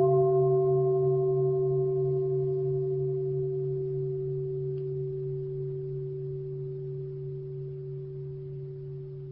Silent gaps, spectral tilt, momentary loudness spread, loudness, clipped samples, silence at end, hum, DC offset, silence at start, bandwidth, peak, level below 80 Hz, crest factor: none; -14.5 dB/octave; 14 LU; -30 LUFS; under 0.1%; 0 s; none; under 0.1%; 0 s; 1.6 kHz; -14 dBFS; -58 dBFS; 14 dB